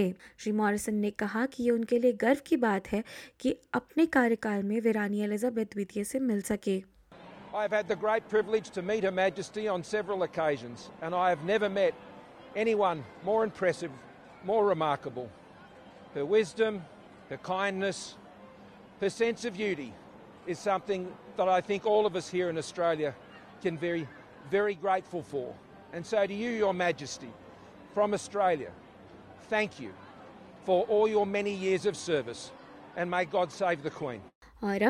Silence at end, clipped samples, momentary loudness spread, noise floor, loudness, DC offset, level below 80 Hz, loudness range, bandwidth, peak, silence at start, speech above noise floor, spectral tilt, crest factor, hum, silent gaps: 0 s; under 0.1%; 17 LU; -52 dBFS; -30 LUFS; under 0.1%; -66 dBFS; 4 LU; 15.5 kHz; -12 dBFS; 0 s; 23 dB; -5 dB/octave; 18 dB; none; 34.35-34.41 s